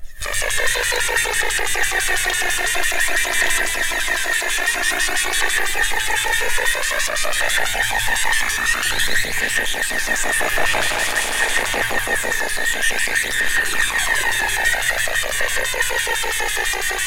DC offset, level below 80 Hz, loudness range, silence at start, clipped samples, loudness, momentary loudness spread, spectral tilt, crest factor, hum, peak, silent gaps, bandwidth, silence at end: under 0.1%; -32 dBFS; 1 LU; 0 s; under 0.1%; -18 LUFS; 2 LU; 0 dB/octave; 14 dB; none; -4 dBFS; none; 17 kHz; 0 s